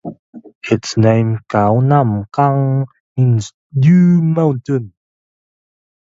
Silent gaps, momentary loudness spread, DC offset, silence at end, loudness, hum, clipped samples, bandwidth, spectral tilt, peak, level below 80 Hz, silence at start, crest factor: 0.19-0.33 s, 0.55-0.61 s, 3.00-3.16 s, 3.54-3.70 s; 11 LU; under 0.1%; 1.25 s; -14 LUFS; none; under 0.1%; 7.8 kHz; -8 dB/octave; 0 dBFS; -50 dBFS; 0.05 s; 14 dB